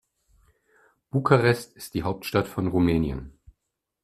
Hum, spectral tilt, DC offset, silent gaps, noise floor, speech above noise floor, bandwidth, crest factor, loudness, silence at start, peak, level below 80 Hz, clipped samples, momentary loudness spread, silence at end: none; -7 dB/octave; under 0.1%; none; -81 dBFS; 57 dB; 14.5 kHz; 24 dB; -25 LUFS; 1.15 s; -4 dBFS; -46 dBFS; under 0.1%; 11 LU; 0.75 s